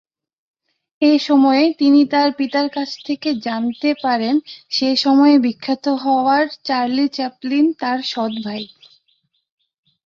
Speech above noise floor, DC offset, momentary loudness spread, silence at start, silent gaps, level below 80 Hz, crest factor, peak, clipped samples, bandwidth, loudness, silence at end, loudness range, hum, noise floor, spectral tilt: 49 dB; under 0.1%; 10 LU; 1 s; none; -66 dBFS; 14 dB; -2 dBFS; under 0.1%; 7.2 kHz; -17 LUFS; 1.4 s; 4 LU; none; -65 dBFS; -4.5 dB/octave